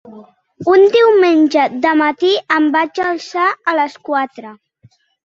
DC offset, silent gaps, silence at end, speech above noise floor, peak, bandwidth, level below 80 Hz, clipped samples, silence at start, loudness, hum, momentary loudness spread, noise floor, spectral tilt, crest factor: under 0.1%; none; 0.8 s; 38 dB; 0 dBFS; 7.4 kHz; -62 dBFS; under 0.1%; 0.05 s; -13 LUFS; none; 10 LU; -51 dBFS; -4.5 dB/octave; 14 dB